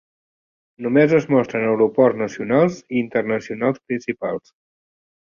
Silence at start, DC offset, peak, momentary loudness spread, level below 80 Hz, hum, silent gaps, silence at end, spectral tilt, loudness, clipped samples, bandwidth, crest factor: 0.8 s; under 0.1%; -2 dBFS; 10 LU; -62 dBFS; none; none; 1 s; -7.5 dB/octave; -19 LUFS; under 0.1%; 7.2 kHz; 18 dB